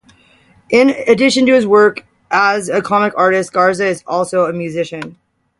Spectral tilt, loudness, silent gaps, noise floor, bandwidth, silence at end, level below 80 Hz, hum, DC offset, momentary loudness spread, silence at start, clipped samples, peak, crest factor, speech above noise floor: -4.5 dB/octave; -13 LUFS; none; -50 dBFS; 11.5 kHz; 0.45 s; -56 dBFS; none; under 0.1%; 11 LU; 0.7 s; under 0.1%; 0 dBFS; 14 dB; 37 dB